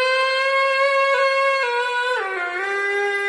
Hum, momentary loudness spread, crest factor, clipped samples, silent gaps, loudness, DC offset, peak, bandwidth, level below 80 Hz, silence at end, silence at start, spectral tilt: none; 6 LU; 10 dB; under 0.1%; none; -19 LUFS; under 0.1%; -10 dBFS; 10.5 kHz; -70 dBFS; 0 s; 0 s; 0 dB/octave